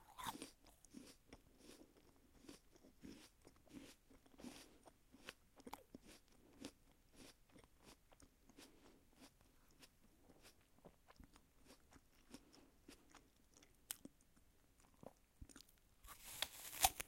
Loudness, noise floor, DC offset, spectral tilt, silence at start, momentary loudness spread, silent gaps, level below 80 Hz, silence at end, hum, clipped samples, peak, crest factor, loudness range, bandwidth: -53 LUFS; -73 dBFS; under 0.1%; -1 dB/octave; 0 s; 17 LU; none; -72 dBFS; 0 s; none; under 0.1%; -18 dBFS; 40 dB; 9 LU; 16.5 kHz